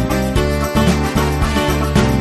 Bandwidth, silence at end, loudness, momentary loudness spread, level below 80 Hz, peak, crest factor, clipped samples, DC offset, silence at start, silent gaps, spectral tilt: 13.5 kHz; 0 s; -16 LUFS; 2 LU; -22 dBFS; 0 dBFS; 14 dB; under 0.1%; under 0.1%; 0 s; none; -5.5 dB/octave